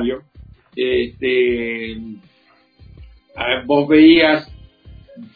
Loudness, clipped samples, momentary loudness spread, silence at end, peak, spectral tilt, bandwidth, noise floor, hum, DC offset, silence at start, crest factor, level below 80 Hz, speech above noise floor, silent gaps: -15 LUFS; under 0.1%; 21 LU; 0.1 s; 0 dBFS; -8 dB/octave; 4.9 kHz; -55 dBFS; none; under 0.1%; 0 s; 18 dB; -44 dBFS; 40 dB; none